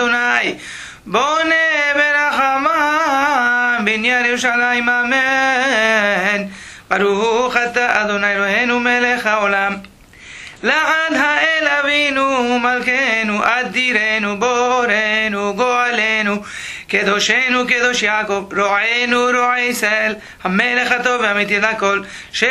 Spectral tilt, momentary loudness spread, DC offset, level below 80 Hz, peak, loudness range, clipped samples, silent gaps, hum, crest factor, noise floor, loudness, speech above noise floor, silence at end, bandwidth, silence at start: -3 dB/octave; 6 LU; under 0.1%; -52 dBFS; 0 dBFS; 2 LU; under 0.1%; none; none; 16 dB; -39 dBFS; -15 LUFS; 23 dB; 0 s; 14 kHz; 0 s